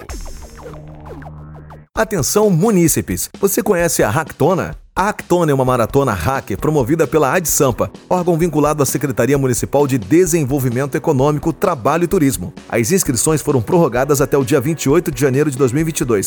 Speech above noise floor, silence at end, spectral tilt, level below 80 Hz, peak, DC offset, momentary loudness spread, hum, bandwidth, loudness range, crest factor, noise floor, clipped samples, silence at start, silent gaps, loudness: 21 dB; 0 s; -5.5 dB/octave; -36 dBFS; -2 dBFS; under 0.1%; 11 LU; none; 19.5 kHz; 1 LU; 12 dB; -36 dBFS; under 0.1%; 0 s; none; -15 LUFS